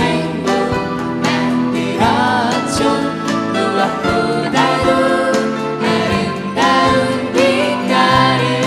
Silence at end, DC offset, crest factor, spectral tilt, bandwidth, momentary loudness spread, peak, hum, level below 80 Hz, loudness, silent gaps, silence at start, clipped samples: 0 s; under 0.1%; 14 dB; -5 dB/octave; 13.5 kHz; 6 LU; 0 dBFS; none; -42 dBFS; -15 LUFS; none; 0 s; under 0.1%